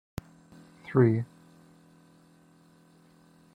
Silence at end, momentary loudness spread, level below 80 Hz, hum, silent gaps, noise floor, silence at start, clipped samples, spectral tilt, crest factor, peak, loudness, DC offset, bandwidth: 2.3 s; 21 LU; -62 dBFS; none; none; -59 dBFS; 0.9 s; under 0.1%; -9.5 dB/octave; 22 dB; -10 dBFS; -27 LUFS; under 0.1%; 11 kHz